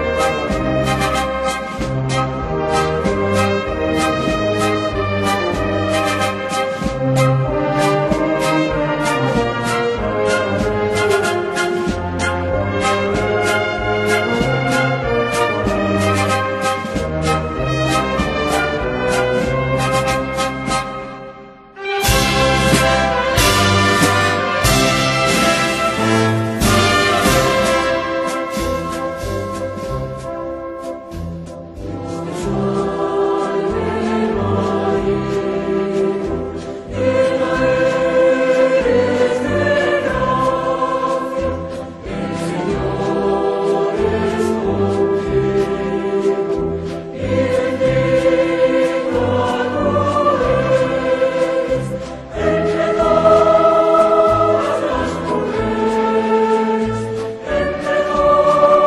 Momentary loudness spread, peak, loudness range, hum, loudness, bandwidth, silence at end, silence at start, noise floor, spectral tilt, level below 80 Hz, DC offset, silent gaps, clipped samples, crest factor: 10 LU; 0 dBFS; 5 LU; none; -17 LUFS; 13 kHz; 0 s; 0 s; -37 dBFS; -5 dB/octave; -34 dBFS; under 0.1%; none; under 0.1%; 16 dB